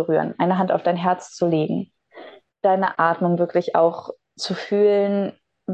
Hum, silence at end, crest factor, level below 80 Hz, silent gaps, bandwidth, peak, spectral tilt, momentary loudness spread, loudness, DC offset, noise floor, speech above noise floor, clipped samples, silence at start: none; 0 s; 16 dB; -72 dBFS; none; 9 kHz; -4 dBFS; -6.5 dB/octave; 12 LU; -21 LUFS; under 0.1%; -44 dBFS; 24 dB; under 0.1%; 0 s